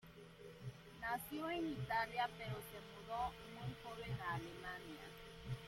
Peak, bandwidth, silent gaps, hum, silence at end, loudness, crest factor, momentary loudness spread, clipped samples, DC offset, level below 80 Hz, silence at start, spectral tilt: -28 dBFS; 16.5 kHz; none; none; 0 s; -46 LUFS; 18 dB; 13 LU; under 0.1%; under 0.1%; -64 dBFS; 0.05 s; -5.5 dB/octave